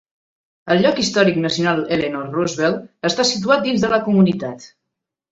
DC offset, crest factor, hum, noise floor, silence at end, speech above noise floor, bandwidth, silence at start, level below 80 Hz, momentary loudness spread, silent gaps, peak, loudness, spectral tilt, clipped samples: under 0.1%; 16 dB; none; -80 dBFS; 0.65 s; 63 dB; 8 kHz; 0.65 s; -54 dBFS; 7 LU; none; -2 dBFS; -18 LUFS; -5 dB/octave; under 0.1%